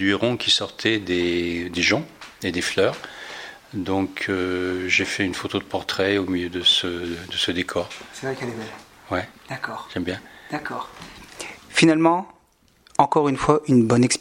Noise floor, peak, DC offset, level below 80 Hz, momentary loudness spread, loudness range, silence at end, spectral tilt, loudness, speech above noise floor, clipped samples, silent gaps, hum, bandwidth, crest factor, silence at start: -59 dBFS; 0 dBFS; under 0.1%; -54 dBFS; 17 LU; 8 LU; 0 s; -4 dB/octave; -22 LUFS; 37 dB; under 0.1%; none; none; 16.5 kHz; 22 dB; 0 s